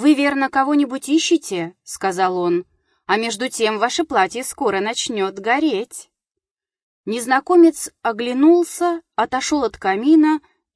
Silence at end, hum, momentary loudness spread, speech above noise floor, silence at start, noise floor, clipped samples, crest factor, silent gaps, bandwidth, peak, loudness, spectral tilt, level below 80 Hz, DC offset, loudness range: 0.35 s; none; 11 LU; 67 dB; 0 s; -85 dBFS; under 0.1%; 16 dB; 6.51-6.55 s, 6.82-7.04 s; 11 kHz; -4 dBFS; -18 LUFS; -3.5 dB/octave; -58 dBFS; under 0.1%; 4 LU